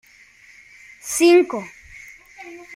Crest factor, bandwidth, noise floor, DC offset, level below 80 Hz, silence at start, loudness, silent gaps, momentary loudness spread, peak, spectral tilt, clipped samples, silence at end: 18 dB; 16 kHz; -50 dBFS; under 0.1%; -60 dBFS; 1.05 s; -17 LUFS; none; 26 LU; -4 dBFS; -2.5 dB/octave; under 0.1%; 0 s